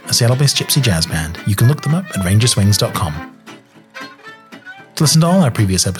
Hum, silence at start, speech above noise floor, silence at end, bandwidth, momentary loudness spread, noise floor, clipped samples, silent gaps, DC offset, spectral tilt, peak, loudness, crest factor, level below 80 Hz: none; 0.05 s; 26 dB; 0 s; 18.5 kHz; 21 LU; -40 dBFS; under 0.1%; none; under 0.1%; -4.5 dB/octave; -2 dBFS; -14 LUFS; 12 dB; -40 dBFS